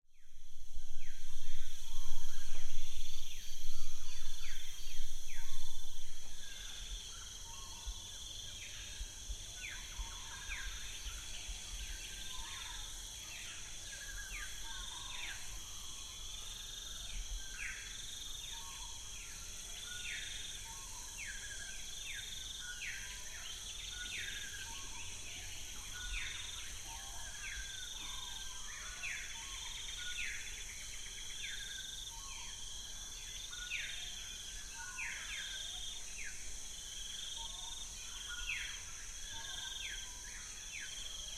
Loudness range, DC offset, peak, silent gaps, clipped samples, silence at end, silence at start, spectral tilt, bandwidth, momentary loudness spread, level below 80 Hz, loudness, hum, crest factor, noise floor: 4 LU; under 0.1%; -16 dBFS; none; under 0.1%; 0 s; 0.2 s; 0 dB/octave; 13.5 kHz; 5 LU; -46 dBFS; -44 LUFS; none; 18 dB; -48 dBFS